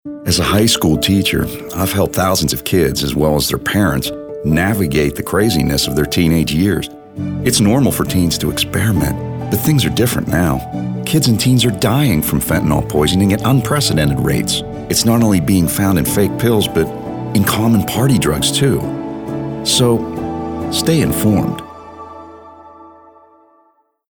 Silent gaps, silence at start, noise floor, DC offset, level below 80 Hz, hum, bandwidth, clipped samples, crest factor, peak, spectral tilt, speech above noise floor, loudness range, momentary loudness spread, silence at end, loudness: none; 0.05 s; -57 dBFS; under 0.1%; -34 dBFS; none; over 20 kHz; under 0.1%; 12 dB; -2 dBFS; -5 dB/octave; 43 dB; 3 LU; 10 LU; 1.2 s; -15 LUFS